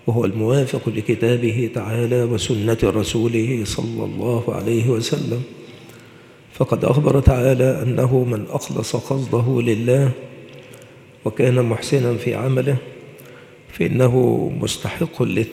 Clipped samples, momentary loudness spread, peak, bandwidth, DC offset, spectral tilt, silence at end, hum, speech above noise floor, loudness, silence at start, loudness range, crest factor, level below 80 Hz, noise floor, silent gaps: under 0.1%; 9 LU; 0 dBFS; 15 kHz; under 0.1%; -6.5 dB/octave; 0 s; none; 26 dB; -19 LUFS; 0.05 s; 3 LU; 20 dB; -38 dBFS; -45 dBFS; none